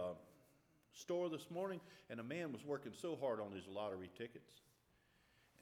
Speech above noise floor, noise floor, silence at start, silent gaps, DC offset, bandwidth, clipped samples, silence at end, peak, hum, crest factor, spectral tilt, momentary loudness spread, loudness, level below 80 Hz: 30 dB; -76 dBFS; 0 s; none; under 0.1%; 17.5 kHz; under 0.1%; 0 s; -32 dBFS; none; 16 dB; -5.5 dB/octave; 11 LU; -47 LUFS; -86 dBFS